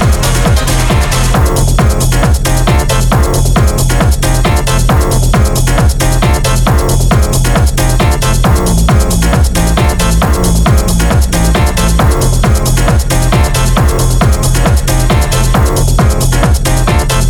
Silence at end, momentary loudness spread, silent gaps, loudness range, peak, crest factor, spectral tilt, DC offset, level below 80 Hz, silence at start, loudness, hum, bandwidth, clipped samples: 0 s; 1 LU; none; 0 LU; 0 dBFS; 8 dB; -5 dB/octave; under 0.1%; -12 dBFS; 0 s; -10 LUFS; none; 19 kHz; under 0.1%